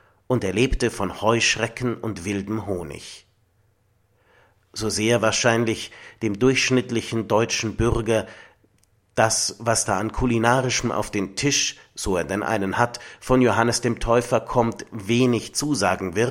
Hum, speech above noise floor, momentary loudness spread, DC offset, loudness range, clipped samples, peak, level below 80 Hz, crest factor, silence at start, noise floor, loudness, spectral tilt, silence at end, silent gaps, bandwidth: none; 42 dB; 10 LU; under 0.1%; 4 LU; under 0.1%; -2 dBFS; -40 dBFS; 22 dB; 0.3 s; -64 dBFS; -22 LUFS; -4 dB/octave; 0 s; none; 16.5 kHz